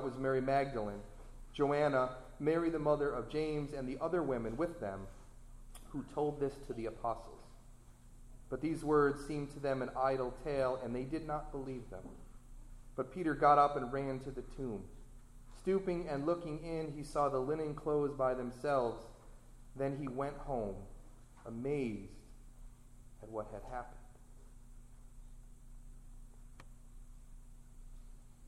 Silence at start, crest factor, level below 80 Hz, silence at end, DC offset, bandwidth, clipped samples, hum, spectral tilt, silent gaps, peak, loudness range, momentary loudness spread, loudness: 0 s; 22 dB; -54 dBFS; 0 s; under 0.1%; 13 kHz; under 0.1%; none; -7 dB/octave; none; -16 dBFS; 10 LU; 18 LU; -37 LUFS